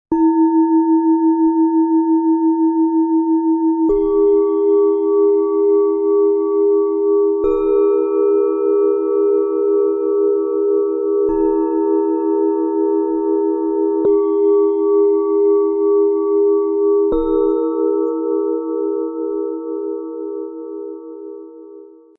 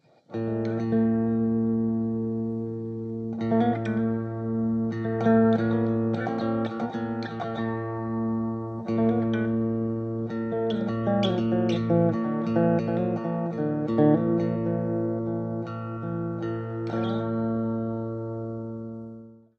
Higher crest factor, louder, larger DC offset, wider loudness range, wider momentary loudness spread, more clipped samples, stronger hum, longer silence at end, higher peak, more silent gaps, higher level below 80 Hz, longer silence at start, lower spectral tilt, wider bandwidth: second, 10 dB vs 18 dB; first, -16 LUFS vs -27 LUFS; neither; about the same, 5 LU vs 5 LU; about the same, 8 LU vs 10 LU; neither; neither; first, 0.35 s vs 0.2 s; about the same, -6 dBFS vs -8 dBFS; neither; first, -46 dBFS vs -60 dBFS; second, 0.1 s vs 0.3 s; first, -11 dB/octave vs -9.5 dB/octave; second, 2.6 kHz vs 6.4 kHz